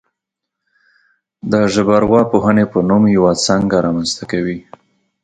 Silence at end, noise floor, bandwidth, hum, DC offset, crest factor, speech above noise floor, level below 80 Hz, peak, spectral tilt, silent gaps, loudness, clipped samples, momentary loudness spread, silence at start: 0.65 s; -80 dBFS; 9.4 kHz; none; under 0.1%; 16 dB; 67 dB; -44 dBFS; 0 dBFS; -5.5 dB/octave; none; -14 LUFS; under 0.1%; 8 LU; 1.45 s